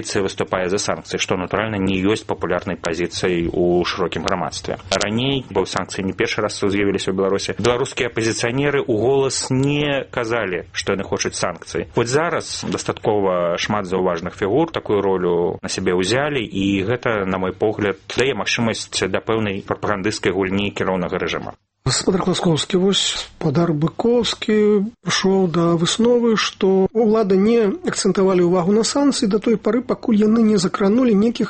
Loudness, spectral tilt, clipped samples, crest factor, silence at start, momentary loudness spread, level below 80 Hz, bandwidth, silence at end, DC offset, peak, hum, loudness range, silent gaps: -19 LUFS; -5 dB/octave; under 0.1%; 18 dB; 0 s; 7 LU; -46 dBFS; 8.8 kHz; 0 s; under 0.1%; 0 dBFS; none; 4 LU; none